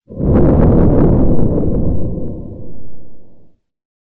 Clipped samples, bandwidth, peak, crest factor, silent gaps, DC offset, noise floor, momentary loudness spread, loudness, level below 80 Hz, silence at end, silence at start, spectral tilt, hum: under 0.1%; 2.8 kHz; 0 dBFS; 12 dB; none; under 0.1%; -41 dBFS; 18 LU; -13 LUFS; -20 dBFS; 0.75 s; 0.1 s; -13.5 dB/octave; none